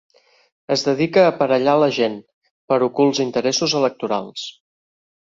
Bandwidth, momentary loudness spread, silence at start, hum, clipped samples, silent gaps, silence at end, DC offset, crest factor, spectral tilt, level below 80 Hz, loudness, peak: 7.8 kHz; 10 LU; 0.7 s; none; under 0.1%; 2.33-2.42 s, 2.51-2.68 s; 0.8 s; under 0.1%; 18 dB; -4.5 dB/octave; -64 dBFS; -18 LUFS; -2 dBFS